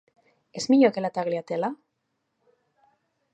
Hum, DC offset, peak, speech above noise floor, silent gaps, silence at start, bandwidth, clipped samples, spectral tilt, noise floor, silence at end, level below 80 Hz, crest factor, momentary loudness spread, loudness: none; under 0.1%; -6 dBFS; 54 dB; none; 0.55 s; 8.8 kHz; under 0.1%; -5.5 dB/octave; -77 dBFS; 1.6 s; -76 dBFS; 20 dB; 18 LU; -24 LUFS